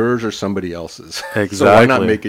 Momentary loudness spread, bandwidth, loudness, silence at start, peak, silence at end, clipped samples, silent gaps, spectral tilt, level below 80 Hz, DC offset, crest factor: 17 LU; 16 kHz; -14 LUFS; 0 s; 0 dBFS; 0 s; under 0.1%; none; -5.5 dB/octave; -48 dBFS; under 0.1%; 14 dB